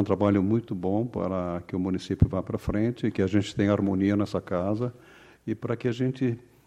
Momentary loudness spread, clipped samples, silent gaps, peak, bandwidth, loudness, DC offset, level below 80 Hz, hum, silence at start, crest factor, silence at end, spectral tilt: 7 LU; under 0.1%; none; -8 dBFS; 10.5 kHz; -27 LUFS; under 0.1%; -44 dBFS; none; 0 s; 20 dB; 0.25 s; -8 dB/octave